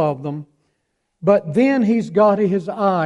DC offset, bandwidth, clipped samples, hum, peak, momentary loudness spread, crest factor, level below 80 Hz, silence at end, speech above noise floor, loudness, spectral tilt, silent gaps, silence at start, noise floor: under 0.1%; 10 kHz; under 0.1%; none; -2 dBFS; 12 LU; 16 dB; -60 dBFS; 0 s; 54 dB; -17 LUFS; -8.5 dB/octave; none; 0 s; -71 dBFS